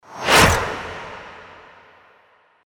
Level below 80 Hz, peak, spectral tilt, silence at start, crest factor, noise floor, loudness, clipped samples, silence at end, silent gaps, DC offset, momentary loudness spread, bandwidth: -38 dBFS; -2 dBFS; -3 dB/octave; 0.1 s; 20 dB; -56 dBFS; -16 LUFS; under 0.1%; 1.25 s; none; under 0.1%; 24 LU; 19 kHz